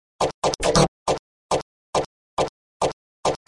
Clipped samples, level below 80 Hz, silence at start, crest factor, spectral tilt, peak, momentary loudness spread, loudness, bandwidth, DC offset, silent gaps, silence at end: under 0.1%; -42 dBFS; 0.2 s; 22 dB; -4 dB/octave; -2 dBFS; 8 LU; -24 LUFS; 11.5 kHz; under 0.1%; 0.34-0.42 s, 0.88-1.06 s, 1.19-1.49 s, 1.62-1.93 s, 2.06-2.37 s, 2.49-2.80 s, 2.93-3.23 s; 0.1 s